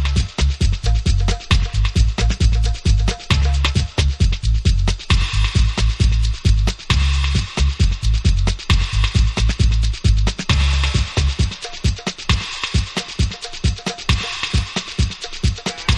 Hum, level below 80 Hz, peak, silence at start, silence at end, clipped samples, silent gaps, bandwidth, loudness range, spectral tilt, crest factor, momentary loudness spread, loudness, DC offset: none; -18 dBFS; -2 dBFS; 0 s; 0 s; under 0.1%; none; 10.5 kHz; 3 LU; -4.5 dB/octave; 14 dB; 5 LU; -19 LUFS; under 0.1%